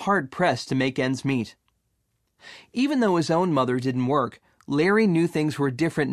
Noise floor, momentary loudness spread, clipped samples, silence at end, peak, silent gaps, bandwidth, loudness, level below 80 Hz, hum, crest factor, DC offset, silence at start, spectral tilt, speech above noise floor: -73 dBFS; 7 LU; under 0.1%; 0 s; -8 dBFS; none; 13.5 kHz; -24 LUFS; -64 dBFS; none; 16 dB; under 0.1%; 0 s; -6.5 dB/octave; 50 dB